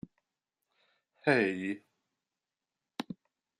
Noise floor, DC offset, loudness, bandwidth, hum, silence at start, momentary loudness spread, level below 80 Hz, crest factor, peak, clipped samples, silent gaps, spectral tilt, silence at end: under -90 dBFS; under 0.1%; -32 LUFS; 12 kHz; none; 1.25 s; 20 LU; -78 dBFS; 26 dB; -12 dBFS; under 0.1%; none; -6 dB/octave; 0.45 s